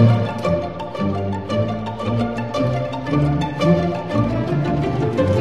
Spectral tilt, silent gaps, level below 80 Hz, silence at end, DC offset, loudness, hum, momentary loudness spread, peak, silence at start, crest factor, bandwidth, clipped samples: -8 dB/octave; none; -38 dBFS; 0 s; 0.8%; -21 LUFS; none; 6 LU; -2 dBFS; 0 s; 16 dB; 10 kHz; under 0.1%